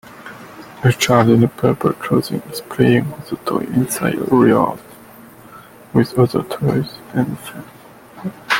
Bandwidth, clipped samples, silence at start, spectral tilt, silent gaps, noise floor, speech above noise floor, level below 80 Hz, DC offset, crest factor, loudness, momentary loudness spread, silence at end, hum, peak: 17 kHz; under 0.1%; 0.1 s; -6 dB/octave; none; -41 dBFS; 25 dB; -50 dBFS; under 0.1%; 18 dB; -17 LUFS; 20 LU; 0 s; none; 0 dBFS